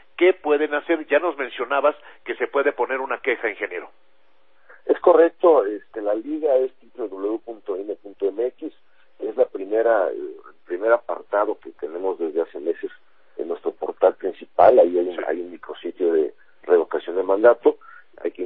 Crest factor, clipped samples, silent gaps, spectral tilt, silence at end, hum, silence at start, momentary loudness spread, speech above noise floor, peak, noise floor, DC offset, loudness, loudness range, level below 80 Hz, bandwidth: 20 dB; under 0.1%; none; -8.5 dB/octave; 0 s; none; 0.2 s; 17 LU; 42 dB; -2 dBFS; -63 dBFS; 0.3%; -21 LUFS; 5 LU; -70 dBFS; 4 kHz